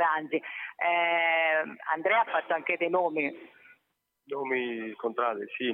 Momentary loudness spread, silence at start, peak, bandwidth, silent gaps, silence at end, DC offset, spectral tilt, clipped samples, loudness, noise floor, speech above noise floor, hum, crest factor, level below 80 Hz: 10 LU; 0 s; -14 dBFS; 4.2 kHz; none; 0 s; under 0.1%; -6.5 dB/octave; under 0.1%; -28 LUFS; -79 dBFS; 50 dB; none; 16 dB; under -90 dBFS